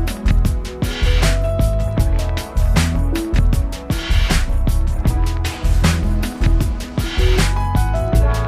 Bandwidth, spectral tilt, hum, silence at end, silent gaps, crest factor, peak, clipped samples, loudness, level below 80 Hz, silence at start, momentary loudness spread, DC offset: 15 kHz; -5.5 dB/octave; none; 0 s; none; 12 dB; -2 dBFS; under 0.1%; -19 LUFS; -18 dBFS; 0 s; 5 LU; under 0.1%